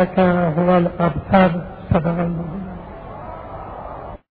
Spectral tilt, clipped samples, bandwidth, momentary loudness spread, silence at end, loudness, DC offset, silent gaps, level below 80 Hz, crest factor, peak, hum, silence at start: -11.5 dB/octave; under 0.1%; 4.7 kHz; 18 LU; 0.15 s; -18 LUFS; under 0.1%; none; -38 dBFS; 18 dB; -2 dBFS; none; 0 s